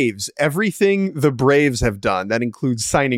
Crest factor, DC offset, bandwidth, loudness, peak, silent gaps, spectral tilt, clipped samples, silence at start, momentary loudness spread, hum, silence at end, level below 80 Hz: 14 dB; under 0.1%; 16.5 kHz; -18 LUFS; -4 dBFS; none; -5 dB/octave; under 0.1%; 0 s; 6 LU; none; 0 s; -40 dBFS